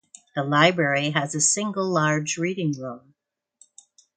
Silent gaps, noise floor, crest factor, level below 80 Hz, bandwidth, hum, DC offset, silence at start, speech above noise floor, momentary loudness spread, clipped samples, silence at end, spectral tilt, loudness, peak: none; -75 dBFS; 22 dB; -70 dBFS; 9.6 kHz; none; under 0.1%; 0.35 s; 52 dB; 14 LU; under 0.1%; 1.2 s; -3.5 dB/octave; -22 LUFS; -2 dBFS